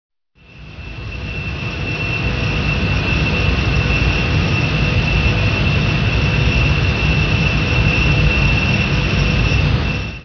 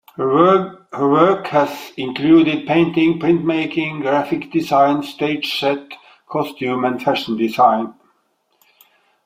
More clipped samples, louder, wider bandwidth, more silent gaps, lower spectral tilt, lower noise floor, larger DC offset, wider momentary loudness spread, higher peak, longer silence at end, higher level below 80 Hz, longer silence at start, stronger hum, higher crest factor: neither; about the same, -16 LUFS vs -17 LUFS; second, 5.4 kHz vs 15.5 kHz; neither; about the same, -6 dB/octave vs -6.5 dB/octave; second, -44 dBFS vs -64 dBFS; neither; about the same, 9 LU vs 10 LU; about the same, -2 dBFS vs 0 dBFS; second, 0 s vs 1.35 s; first, -22 dBFS vs -60 dBFS; first, 0.55 s vs 0.2 s; neither; about the same, 14 dB vs 16 dB